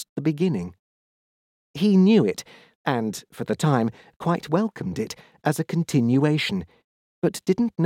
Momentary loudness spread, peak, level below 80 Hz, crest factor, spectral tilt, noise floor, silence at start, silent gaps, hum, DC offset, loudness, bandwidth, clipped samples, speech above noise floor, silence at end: 13 LU; -6 dBFS; -60 dBFS; 18 dB; -6.5 dB/octave; under -90 dBFS; 0 s; 0.09-0.16 s, 0.79-1.74 s, 2.75-2.84 s, 4.16-4.20 s, 6.84-7.22 s; none; under 0.1%; -23 LUFS; 16 kHz; under 0.1%; over 68 dB; 0 s